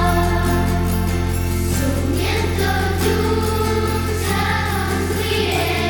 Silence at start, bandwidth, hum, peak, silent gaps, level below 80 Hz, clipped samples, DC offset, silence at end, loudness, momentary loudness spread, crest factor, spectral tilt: 0 s; over 20 kHz; none; -4 dBFS; none; -26 dBFS; under 0.1%; under 0.1%; 0 s; -19 LUFS; 2 LU; 14 dB; -5 dB/octave